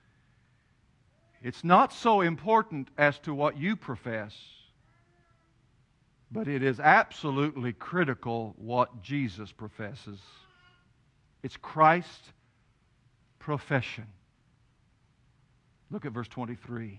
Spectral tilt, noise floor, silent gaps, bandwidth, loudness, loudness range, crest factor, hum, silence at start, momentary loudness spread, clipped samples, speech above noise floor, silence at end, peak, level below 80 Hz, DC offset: -7 dB/octave; -67 dBFS; none; 10.5 kHz; -28 LUFS; 11 LU; 26 dB; none; 1.45 s; 21 LU; under 0.1%; 39 dB; 0 s; -6 dBFS; -68 dBFS; under 0.1%